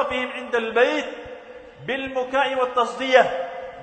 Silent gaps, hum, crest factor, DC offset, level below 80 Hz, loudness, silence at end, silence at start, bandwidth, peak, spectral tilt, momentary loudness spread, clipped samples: none; none; 22 dB; under 0.1%; -58 dBFS; -22 LUFS; 0 s; 0 s; 9 kHz; -2 dBFS; -3.5 dB/octave; 19 LU; under 0.1%